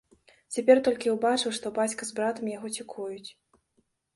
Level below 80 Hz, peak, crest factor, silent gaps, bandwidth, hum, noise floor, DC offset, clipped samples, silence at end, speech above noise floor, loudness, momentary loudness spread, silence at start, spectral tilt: -70 dBFS; -6 dBFS; 22 dB; none; 11.5 kHz; none; -73 dBFS; under 0.1%; under 0.1%; 0.85 s; 46 dB; -27 LUFS; 16 LU; 0.5 s; -3 dB/octave